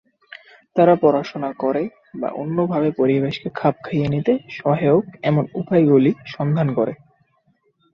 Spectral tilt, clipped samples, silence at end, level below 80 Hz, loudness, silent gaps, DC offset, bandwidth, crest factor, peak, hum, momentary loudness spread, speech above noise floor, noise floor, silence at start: -9.5 dB/octave; under 0.1%; 1 s; -58 dBFS; -19 LUFS; none; under 0.1%; 6.4 kHz; 18 dB; -2 dBFS; none; 10 LU; 45 dB; -63 dBFS; 0.75 s